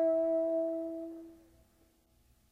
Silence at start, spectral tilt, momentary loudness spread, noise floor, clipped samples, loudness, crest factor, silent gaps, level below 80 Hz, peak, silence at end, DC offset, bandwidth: 0 s; -7.5 dB/octave; 20 LU; -69 dBFS; under 0.1%; -34 LUFS; 12 dB; none; -72 dBFS; -22 dBFS; 1.15 s; under 0.1%; 2.8 kHz